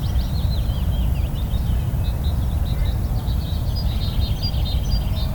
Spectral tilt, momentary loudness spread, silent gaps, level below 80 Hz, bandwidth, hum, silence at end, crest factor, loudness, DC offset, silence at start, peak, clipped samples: -6.5 dB/octave; 1 LU; none; -22 dBFS; 19.5 kHz; none; 0 s; 12 dB; -23 LUFS; under 0.1%; 0 s; -8 dBFS; under 0.1%